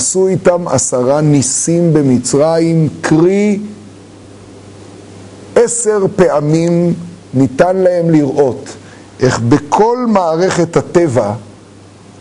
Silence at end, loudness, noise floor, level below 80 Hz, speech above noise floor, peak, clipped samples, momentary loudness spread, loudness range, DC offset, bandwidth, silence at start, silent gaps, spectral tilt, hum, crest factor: 0.7 s; -12 LUFS; -38 dBFS; -46 dBFS; 27 dB; 0 dBFS; under 0.1%; 6 LU; 4 LU; under 0.1%; 11 kHz; 0 s; none; -5.5 dB/octave; none; 12 dB